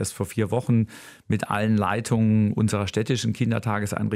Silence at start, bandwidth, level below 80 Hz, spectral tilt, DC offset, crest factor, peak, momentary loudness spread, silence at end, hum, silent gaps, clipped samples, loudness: 0 s; 15 kHz; -54 dBFS; -6 dB/octave; under 0.1%; 16 dB; -8 dBFS; 7 LU; 0 s; none; none; under 0.1%; -24 LUFS